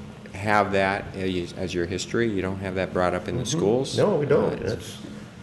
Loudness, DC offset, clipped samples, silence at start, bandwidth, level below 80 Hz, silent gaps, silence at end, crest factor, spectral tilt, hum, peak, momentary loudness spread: -25 LUFS; under 0.1%; under 0.1%; 0 s; 12 kHz; -52 dBFS; none; 0 s; 20 dB; -5.5 dB/octave; none; -6 dBFS; 10 LU